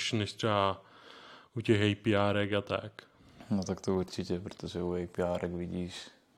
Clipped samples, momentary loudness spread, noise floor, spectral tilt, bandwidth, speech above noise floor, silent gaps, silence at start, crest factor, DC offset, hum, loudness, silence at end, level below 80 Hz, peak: under 0.1%; 16 LU; -54 dBFS; -6 dB/octave; 12 kHz; 21 dB; none; 0 s; 20 dB; under 0.1%; none; -33 LUFS; 0.3 s; -68 dBFS; -12 dBFS